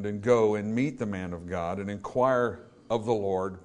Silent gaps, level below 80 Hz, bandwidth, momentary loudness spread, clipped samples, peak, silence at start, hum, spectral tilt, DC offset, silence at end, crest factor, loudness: none; -62 dBFS; 10 kHz; 11 LU; under 0.1%; -10 dBFS; 0 s; none; -7 dB/octave; under 0.1%; 0 s; 18 dB; -28 LUFS